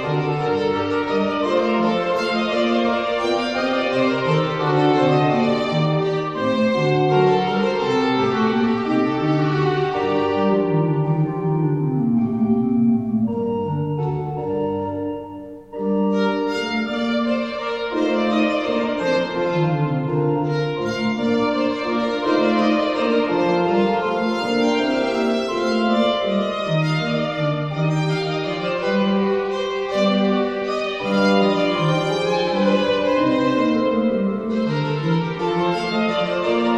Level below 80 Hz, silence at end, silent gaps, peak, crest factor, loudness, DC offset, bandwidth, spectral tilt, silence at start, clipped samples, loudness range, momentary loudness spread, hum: -54 dBFS; 0 s; none; -6 dBFS; 14 dB; -20 LUFS; 0.1%; 9 kHz; -7 dB/octave; 0 s; under 0.1%; 3 LU; 5 LU; none